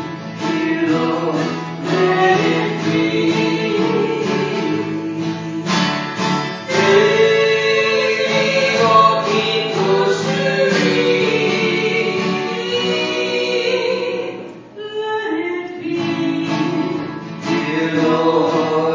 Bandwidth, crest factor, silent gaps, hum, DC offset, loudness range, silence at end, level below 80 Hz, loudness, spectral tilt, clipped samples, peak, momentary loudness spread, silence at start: 7.6 kHz; 16 dB; none; none; under 0.1%; 7 LU; 0 s; -62 dBFS; -17 LUFS; -5 dB/octave; under 0.1%; 0 dBFS; 10 LU; 0 s